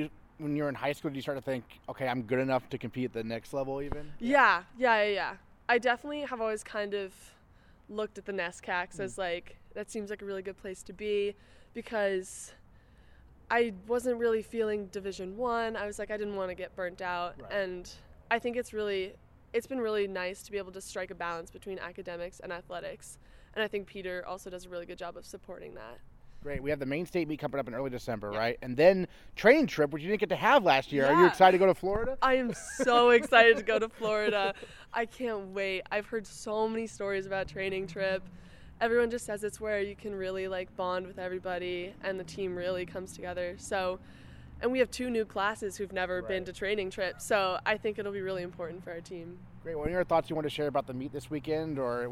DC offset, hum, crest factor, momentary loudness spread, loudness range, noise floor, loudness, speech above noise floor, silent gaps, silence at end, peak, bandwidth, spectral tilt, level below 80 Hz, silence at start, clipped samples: under 0.1%; none; 24 dB; 17 LU; 12 LU; -59 dBFS; -31 LUFS; 28 dB; none; 0 s; -6 dBFS; 16 kHz; -4.5 dB/octave; -56 dBFS; 0 s; under 0.1%